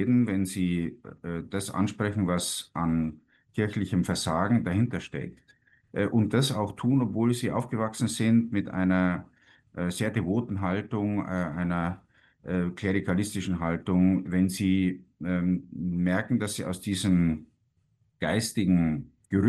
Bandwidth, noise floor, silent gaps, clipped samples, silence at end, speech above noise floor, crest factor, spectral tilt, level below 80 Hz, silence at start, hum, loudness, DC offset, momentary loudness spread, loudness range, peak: 12.5 kHz; -70 dBFS; none; under 0.1%; 0 s; 43 dB; 18 dB; -6 dB/octave; -54 dBFS; 0 s; none; -28 LUFS; under 0.1%; 10 LU; 3 LU; -10 dBFS